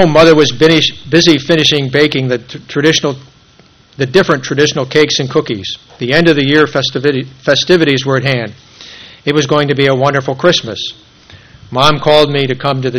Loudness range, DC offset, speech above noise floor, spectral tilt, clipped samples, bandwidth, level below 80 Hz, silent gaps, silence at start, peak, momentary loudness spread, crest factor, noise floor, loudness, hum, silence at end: 3 LU; under 0.1%; 34 dB; -4.5 dB/octave; 0.7%; 13 kHz; -42 dBFS; none; 0 s; 0 dBFS; 12 LU; 12 dB; -45 dBFS; -11 LUFS; none; 0 s